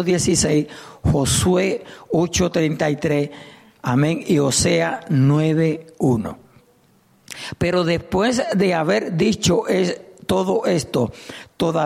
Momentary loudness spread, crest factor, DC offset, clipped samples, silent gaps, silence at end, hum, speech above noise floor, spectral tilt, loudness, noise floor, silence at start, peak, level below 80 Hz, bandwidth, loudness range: 11 LU; 14 dB; under 0.1%; under 0.1%; none; 0 s; none; 37 dB; -5 dB/octave; -19 LUFS; -56 dBFS; 0 s; -6 dBFS; -42 dBFS; 15.5 kHz; 2 LU